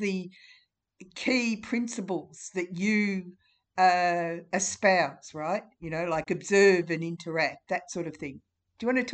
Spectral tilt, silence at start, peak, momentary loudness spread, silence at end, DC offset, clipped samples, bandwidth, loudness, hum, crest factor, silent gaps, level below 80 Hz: -4.5 dB/octave; 0 s; -10 dBFS; 14 LU; 0 s; under 0.1%; under 0.1%; 9.2 kHz; -28 LUFS; none; 20 dB; none; -66 dBFS